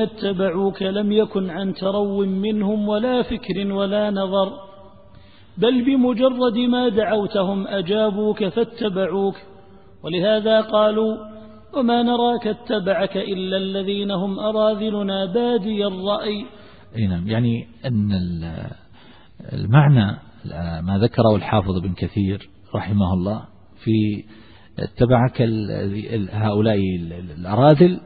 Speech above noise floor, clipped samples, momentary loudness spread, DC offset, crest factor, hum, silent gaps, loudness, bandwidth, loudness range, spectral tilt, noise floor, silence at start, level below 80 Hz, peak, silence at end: 29 dB; under 0.1%; 12 LU; 0.4%; 20 dB; none; none; -20 LUFS; 4.9 kHz; 3 LU; -11.5 dB/octave; -48 dBFS; 0 s; -48 dBFS; 0 dBFS; 0 s